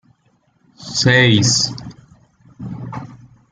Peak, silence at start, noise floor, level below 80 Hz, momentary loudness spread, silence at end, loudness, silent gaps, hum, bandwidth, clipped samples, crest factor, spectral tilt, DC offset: -2 dBFS; 0.8 s; -60 dBFS; -50 dBFS; 24 LU; 0.35 s; -14 LUFS; none; none; 9.6 kHz; under 0.1%; 18 dB; -3.5 dB/octave; under 0.1%